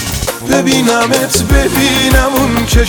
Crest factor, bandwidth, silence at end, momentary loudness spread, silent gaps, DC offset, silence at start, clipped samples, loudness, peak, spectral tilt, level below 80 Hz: 10 dB; over 20 kHz; 0 s; 3 LU; none; under 0.1%; 0 s; under 0.1%; -11 LUFS; 0 dBFS; -4 dB/octave; -18 dBFS